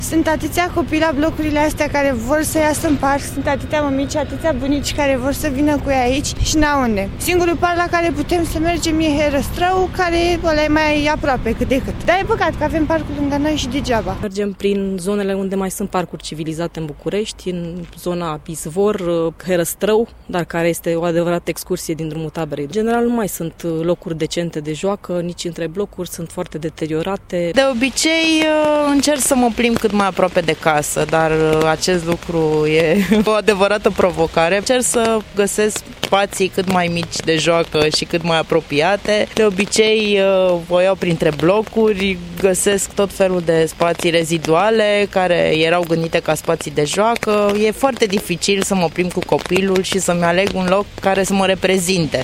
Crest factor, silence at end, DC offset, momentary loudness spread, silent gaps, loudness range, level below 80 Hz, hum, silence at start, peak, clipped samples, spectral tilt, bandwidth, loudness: 16 dB; 0 s; under 0.1%; 8 LU; none; 6 LU; -34 dBFS; none; 0 s; 0 dBFS; under 0.1%; -4.5 dB/octave; 16.5 kHz; -17 LUFS